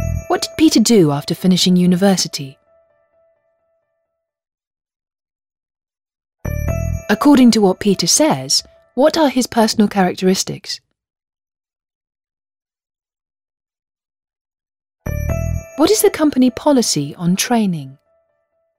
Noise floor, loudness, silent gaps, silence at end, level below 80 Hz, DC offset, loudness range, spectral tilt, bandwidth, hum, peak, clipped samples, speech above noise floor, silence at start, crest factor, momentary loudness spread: -74 dBFS; -15 LUFS; 4.67-4.71 s, 11.95-12.01 s, 14.41-14.45 s; 0.85 s; -36 dBFS; under 0.1%; 16 LU; -4.5 dB/octave; 16 kHz; none; -2 dBFS; under 0.1%; 60 dB; 0 s; 16 dB; 14 LU